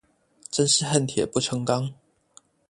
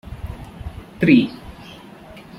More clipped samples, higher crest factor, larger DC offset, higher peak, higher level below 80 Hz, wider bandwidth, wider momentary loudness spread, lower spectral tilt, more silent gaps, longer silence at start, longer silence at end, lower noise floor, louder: neither; about the same, 24 dB vs 20 dB; neither; about the same, -4 dBFS vs -2 dBFS; second, -60 dBFS vs -40 dBFS; about the same, 11.5 kHz vs 12 kHz; second, 8 LU vs 26 LU; second, -4 dB/octave vs -7.5 dB/octave; neither; first, 0.5 s vs 0.1 s; first, 0.75 s vs 0.2 s; first, -57 dBFS vs -41 dBFS; second, -24 LUFS vs -17 LUFS